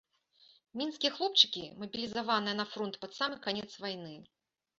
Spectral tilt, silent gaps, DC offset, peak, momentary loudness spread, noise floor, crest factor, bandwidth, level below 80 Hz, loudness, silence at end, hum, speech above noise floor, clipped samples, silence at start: -0.5 dB/octave; none; under 0.1%; -8 dBFS; 15 LU; -66 dBFS; 28 dB; 7.8 kHz; -76 dBFS; -32 LUFS; 0.55 s; none; 32 dB; under 0.1%; 0.75 s